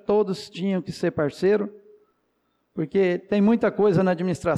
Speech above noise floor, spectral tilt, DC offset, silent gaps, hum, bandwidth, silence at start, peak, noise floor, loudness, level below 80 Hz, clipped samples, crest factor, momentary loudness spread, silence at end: 49 dB; -7.5 dB/octave; under 0.1%; none; none; 11.5 kHz; 0.1 s; -12 dBFS; -71 dBFS; -23 LUFS; -58 dBFS; under 0.1%; 12 dB; 8 LU; 0 s